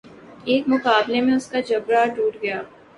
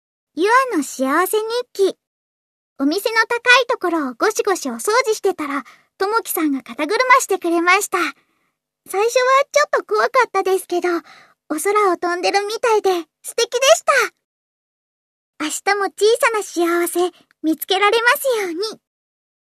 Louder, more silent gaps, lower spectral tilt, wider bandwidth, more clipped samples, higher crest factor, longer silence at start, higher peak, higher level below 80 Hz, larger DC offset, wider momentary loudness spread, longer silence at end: about the same, -20 LUFS vs -18 LUFS; second, none vs 2.07-2.76 s, 14.24-15.33 s; first, -4.5 dB/octave vs -0.5 dB/octave; second, 11 kHz vs 14 kHz; neither; about the same, 18 dB vs 18 dB; second, 0.1 s vs 0.35 s; second, -4 dBFS vs 0 dBFS; first, -64 dBFS vs -74 dBFS; neither; about the same, 9 LU vs 10 LU; second, 0.3 s vs 0.65 s